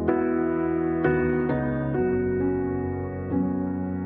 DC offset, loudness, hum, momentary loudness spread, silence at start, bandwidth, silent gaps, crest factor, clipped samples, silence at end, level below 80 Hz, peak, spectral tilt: under 0.1%; -25 LUFS; none; 5 LU; 0 s; 3.7 kHz; none; 16 dB; under 0.1%; 0 s; -44 dBFS; -10 dBFS; -9 dB/octave